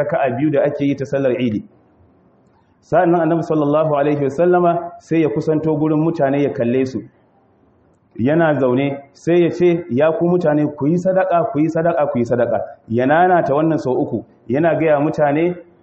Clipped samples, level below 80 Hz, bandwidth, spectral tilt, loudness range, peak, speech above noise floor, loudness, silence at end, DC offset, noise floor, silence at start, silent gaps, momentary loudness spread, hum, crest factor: under 0.1%; -56 dBFS; 7.8 kHz; -8.5 dB/octave; 3 LU; -2 dBFS; 39 dB; -17 LUFS; 0.2 s; under 0.1%; -55 dBFS; 0 s; none; 7 LU; none; 14 dB